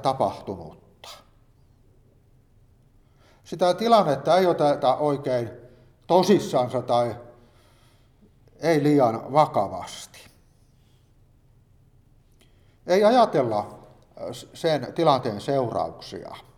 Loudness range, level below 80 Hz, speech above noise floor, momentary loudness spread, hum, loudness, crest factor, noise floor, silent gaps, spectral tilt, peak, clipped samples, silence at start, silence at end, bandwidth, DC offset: 7 LU; -60 dBFS; 36 dB; 20 LU; none; -22 LUFS; 20 dB; -58 dBFS; none; -6 dB/octave; -4 dBFS; under 0.1%; 0 s; 0.15 s; 15 kHz; under 0.1%